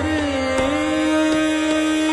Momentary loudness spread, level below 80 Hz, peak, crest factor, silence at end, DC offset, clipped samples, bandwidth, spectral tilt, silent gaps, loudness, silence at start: 3 LU; -38 dBFS; -8 dBFS; 12 dB; 0 s; under 0.1%; under 0.1%; 11.5 kHz; -4.5 dB/octave; none; -19 LUFS; 0 s